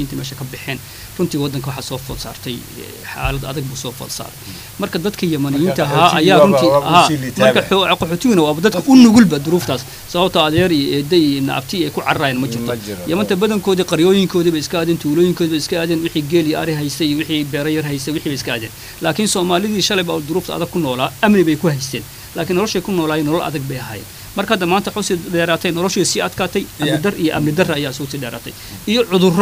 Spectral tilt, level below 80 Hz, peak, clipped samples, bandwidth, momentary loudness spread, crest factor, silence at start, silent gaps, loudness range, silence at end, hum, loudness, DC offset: -5 dB/octave; -42 dBFS; 0 dBFS; under 0.1%; 16 kHz; 14 LU; 16 dB; 0 s; none; 9 LU; 0 s; none; -16 LUFS; under 0.1%